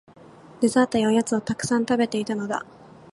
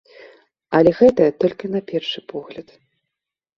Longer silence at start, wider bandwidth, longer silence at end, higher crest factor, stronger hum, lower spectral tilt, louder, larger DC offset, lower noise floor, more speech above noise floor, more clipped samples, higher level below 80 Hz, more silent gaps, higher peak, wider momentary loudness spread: about the same, 0.6 s vs 0.7 s; first, 11.5 kHz vs 7 kHz; second, 0.5 s vs 1 s; about the same, 18 dB vs 18 dB; neither; second, -5 dB/octave vs -7.5 dB/octave; second, -23 LUFS vs -18 LUFS; neither; second, -48 dBFS vs -84 dBFS; second, 25 dB vs 66 dB; neither; second, -60 dBFS vs -54 dBFS; neither; second, -6 dBFS vs -2 dBFS; second, 9 LU vs 19 LU